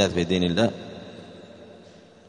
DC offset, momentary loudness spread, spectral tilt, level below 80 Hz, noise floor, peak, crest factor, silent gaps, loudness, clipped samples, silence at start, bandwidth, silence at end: under 0.1%; 24 LU; -5.5 dB/octave; -54 dBFS; -49 dBFS; -6 dBFS; 22 dB; none; -23 LUFS; under 0.1%; 0 s; 10.5 kHz; 0.55 s